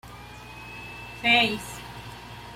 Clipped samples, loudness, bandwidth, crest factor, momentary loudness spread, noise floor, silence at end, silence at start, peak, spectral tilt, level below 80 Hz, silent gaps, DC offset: under 0.1%; -22 LUFS; 16 kHz; 20 dB; 22 LU; -43 dBFS; 0 s; 0.05 s; -10 dBFS; -3 dB/octave; -52 dBFS; none; under 0.1%